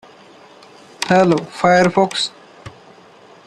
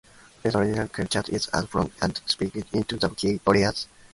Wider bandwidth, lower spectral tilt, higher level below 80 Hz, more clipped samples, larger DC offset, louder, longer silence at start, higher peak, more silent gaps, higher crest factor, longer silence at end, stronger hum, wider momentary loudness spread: about the same, 12.5 kHz vs 11.5 kHz; about the same, -5 dB/octave vs -5 dB/octave; second, -58 dBFS vs -48 dBFS; neither; neither; first, -16 LUFS vs -26 LUFS; first, 1 s vs 0.45 s; first, 0 dBFS vs -4 dBFS; neither; about the same, 18 dB vs 22 dB; first, 0.8 s vs 0.3 s; neither; first, 10 LU vs 7 LU